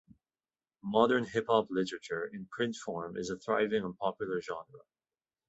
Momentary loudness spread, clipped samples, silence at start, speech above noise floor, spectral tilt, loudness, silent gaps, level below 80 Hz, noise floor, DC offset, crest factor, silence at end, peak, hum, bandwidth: 11 LU; under 0.1%; 0.85 s; over 57 dB; -5 dB/octave; -33 LUFS; none; -70 dBFS; under -90 dBFS; under 0.1%; 22 dB; 0.7 s; -12 dBFS; none; 8.2 kHz